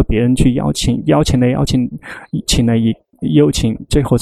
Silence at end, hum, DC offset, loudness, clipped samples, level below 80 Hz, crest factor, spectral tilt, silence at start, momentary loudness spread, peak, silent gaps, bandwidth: 0 s; none; under 0.1%; -15 LUFS; under 0.1%; -26 dBFS; 14 dB; -6 dB/octave; 0 s; 9 LU; 0 dBFS; none; 14 kHz